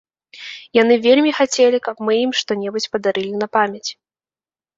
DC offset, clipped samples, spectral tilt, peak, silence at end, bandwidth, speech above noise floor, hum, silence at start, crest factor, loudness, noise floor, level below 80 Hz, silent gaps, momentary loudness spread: under 0.1%; under 0.1%; -3.5 dB/octave; -2 dBFS; 0.85 s; 7.8 kHz; over 73 dB; none; 0.35 s; 18 dB; -17 LUFS; under -90 dBFS; -64 dBFS; none; 15 LU